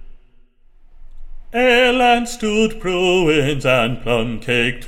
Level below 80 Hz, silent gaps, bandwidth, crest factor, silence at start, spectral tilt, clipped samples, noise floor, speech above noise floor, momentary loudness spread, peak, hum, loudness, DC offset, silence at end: -34 dBFS; none; 16.5 kHz; 16 dB; 0 s; -4.5 dB/octave; under 0.1%; -48 dBFS; 32 dB; 7 LU; -2 dBFS; none; -16 LUFS; under 0.1%; 0 s